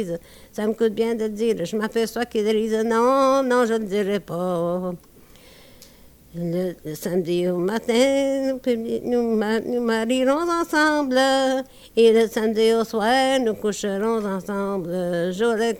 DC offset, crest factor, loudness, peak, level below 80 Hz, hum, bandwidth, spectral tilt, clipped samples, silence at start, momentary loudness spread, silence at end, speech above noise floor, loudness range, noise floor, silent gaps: under 0.1%; 16 dB; -22 LUFS; -6 dBFS; -56 dBFS; none; 19 kHz; -5 dB/octave; under 0.1%; 0 s; 8 LU; 0 s; 28 dB; 7 LU; -49 dBFS; none